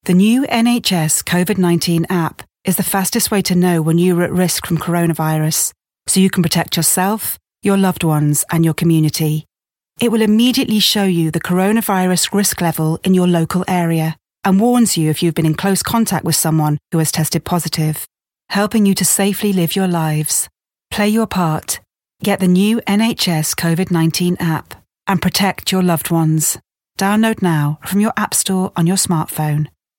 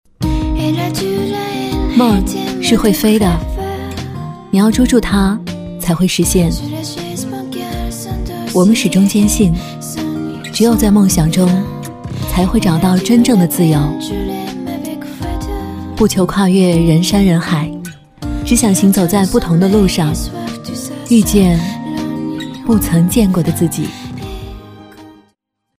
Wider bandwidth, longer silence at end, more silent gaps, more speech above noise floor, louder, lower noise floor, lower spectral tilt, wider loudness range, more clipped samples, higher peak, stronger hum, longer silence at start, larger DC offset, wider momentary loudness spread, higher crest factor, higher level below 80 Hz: about the same, 17 kHz vs 16 kHz; second, 0.3 s vs 0.7 s; neither; about the same, 52 dB vs 51 dB; about the same, -15 LUFS vs -14 LUFS; first, -67 dBFS vs -63 dBFS; about the same, -4.5 dB/octave vs -5.5 dB/octave; about the same, 2 LU vs 3 LU; neither; about the same, 0 dBFS vs 0 dBFS; neither; second, 0.05 s vs 0.2 s; neither; second, 7 LU vs 13 LU; about the same, 16 dB vs 14 dB; second, -50 dBFS vs -28 dBFS